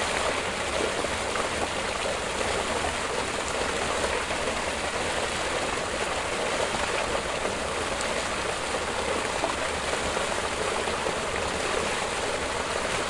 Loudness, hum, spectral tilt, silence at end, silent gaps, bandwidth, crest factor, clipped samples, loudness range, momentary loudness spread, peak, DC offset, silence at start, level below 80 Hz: -27 LUFS; none; -2.5 dB/octave; 0 s; none; 11.5 kHz; 18 dB; under 0.1%; 0 LU; 2 LU; -10 dBFS; 0.2%; 0 s; -46 dBFS